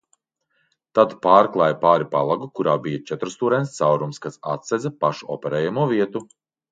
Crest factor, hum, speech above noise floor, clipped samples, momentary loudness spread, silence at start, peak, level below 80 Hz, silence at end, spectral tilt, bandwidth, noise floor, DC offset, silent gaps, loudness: 20 dB; none; 50 dB; under 0.1%; 13 LU; 0.95 s; 0 dBFS; -68 dBFS; 0.5 s; -6.5 dB/octave; 9.2 kHz; -70 dBFS; under 0.1%; none; -21 LUFS